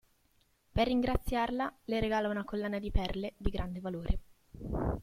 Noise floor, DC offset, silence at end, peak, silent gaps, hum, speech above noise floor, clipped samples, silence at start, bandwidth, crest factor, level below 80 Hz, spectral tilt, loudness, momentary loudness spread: -71 dBFS; under 0.1%; 0 s; -14 dBFS; none; none; 38 dB; under 0.1%; 0.75 s; 16 kHz; 18 dB; -40 dBFS; -7 dB/octave; -35 LUFS; 8 LU